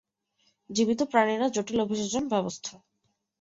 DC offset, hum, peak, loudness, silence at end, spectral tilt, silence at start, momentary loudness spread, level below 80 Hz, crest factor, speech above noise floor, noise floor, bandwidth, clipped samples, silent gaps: under 0.1%; none; -8 dBFS; -27 LUFS; 0.7 s; -4 dB/octave; 0.7 s; 10 LU; -64 dBFS; 22 dB; 50 dB; -77 dBFS; 8 kHz; under 0.1%; none